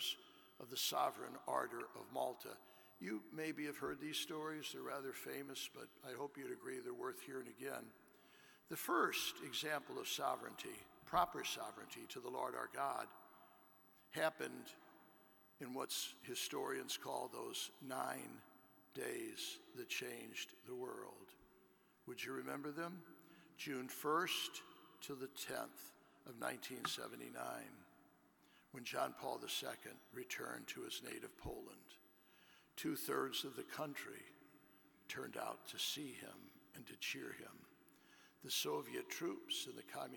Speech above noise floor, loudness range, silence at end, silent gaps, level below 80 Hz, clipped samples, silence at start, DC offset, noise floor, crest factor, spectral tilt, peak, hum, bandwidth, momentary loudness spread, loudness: 26 dB; 6 LU; 0 s; none; -78 dBFS; under 0.1%; 0 s; under 0.1%; -72 dBFS; 24 dB; -2.5 dB/octave; -22 dBFS; none; 17.5 kHz; 18 LU; -46 LUFS